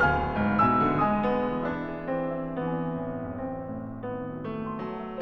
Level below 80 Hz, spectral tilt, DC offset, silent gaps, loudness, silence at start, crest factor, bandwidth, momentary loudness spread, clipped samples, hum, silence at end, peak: -46 dBFS; -9 dB/octave; under 0.1%; none; -28 LUFS; 0 s; 16 dB; 6.2 kHz; 12 LU; under 0.1%; none; 0 s; -10 dBFS